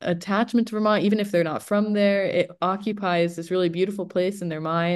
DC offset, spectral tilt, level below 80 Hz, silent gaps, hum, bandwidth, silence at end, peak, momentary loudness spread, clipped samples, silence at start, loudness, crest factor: under 0.1%; -6.5 dB/octave; -70 dBFS; none; none; 12.5 kHz; 0 s; -8 dBFS; 5 LU; under 0.1%; 0 s; -23 LUFS; 14 dB